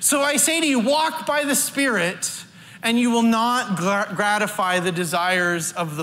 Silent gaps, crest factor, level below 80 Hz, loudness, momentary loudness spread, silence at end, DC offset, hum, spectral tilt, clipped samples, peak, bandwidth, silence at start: none; 16 dB; -68 dBFS; -20 LUFS; 6 LU; 0 s; under 0.1%; none; -3 dB/octave; under 0.1%; -6 dBFS; 16 kHz; 0 s